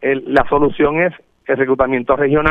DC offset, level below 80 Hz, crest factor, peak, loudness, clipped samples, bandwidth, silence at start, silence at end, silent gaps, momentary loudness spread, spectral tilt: under 0.1%; -36 dBFS; 14 dB; 0 dBFS; -15 LUFS; under 0.1%; 5.2 kHz; 0 s; 0 s; none; 6 LU; -8.5 dB/octave